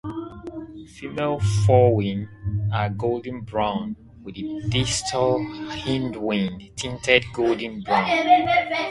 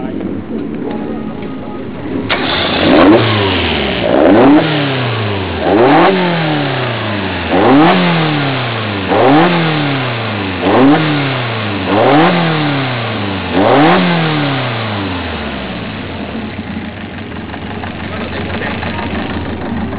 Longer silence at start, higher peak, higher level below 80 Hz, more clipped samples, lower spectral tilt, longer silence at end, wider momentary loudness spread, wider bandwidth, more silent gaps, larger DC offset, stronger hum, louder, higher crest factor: about the same, 0.05 s vs 0 s; about the same, 0 dBFS vs 0 dBFS; second, -44 dBFS vs -34 dBFS; neither; second, -5 dB/octave vs -10 dB/octave; about the same, 0 s vs 0 s; first, 17 LU vs 14 LU; first, 11.5 kHz vs 4 kHz; neither; neither; neither; second, -22 LUFS vs -12 LUFS; first, 22 dB vs 12 dB